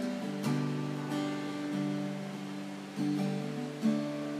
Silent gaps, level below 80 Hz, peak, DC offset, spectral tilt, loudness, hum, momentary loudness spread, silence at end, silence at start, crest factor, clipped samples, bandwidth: none; -84 dBFS; -18 dBFS; under 0.1%; -6.5 dB/octave; -35 LUFS; none; 8 LU; 0 s; 0 s; 16 dB; under 0.1%; 15 kHz